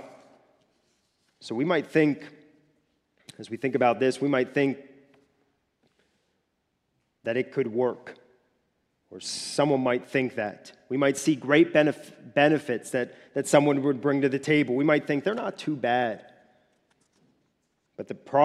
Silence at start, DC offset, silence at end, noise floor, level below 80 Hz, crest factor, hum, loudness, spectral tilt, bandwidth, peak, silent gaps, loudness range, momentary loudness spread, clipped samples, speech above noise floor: 0 s; under 0.1%; 0 s; -76 dBFS; -76 dBFS; 22 dB; none; -25 LUFS; -5.5 dB/octave; 13 kHz; -6 dBFS; none; 9 LU; 17 LU; under 0.1%; 51 dB